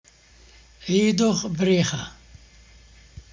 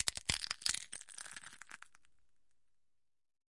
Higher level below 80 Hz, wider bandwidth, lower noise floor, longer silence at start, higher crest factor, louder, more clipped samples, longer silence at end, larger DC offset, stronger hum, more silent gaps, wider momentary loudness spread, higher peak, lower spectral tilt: first, -52 dBFS vs -64 dBFS; second, 7.6 kHz vs 11.5 kHz; second, -52 dBFS vs -82 dBFS; first, 0.8 s vs 0 s; second, 18 dB vs 34 dB; first, -22 LUFS vs -39 LUFS; neither; about the same, 0.1 s vs 0.05 s; neither; neither; neither; about the same, 16 LU vs 18 LU; first, -8 dBFS vs -12 dBFS; first, -5 dB/octave vs 0 dB/octave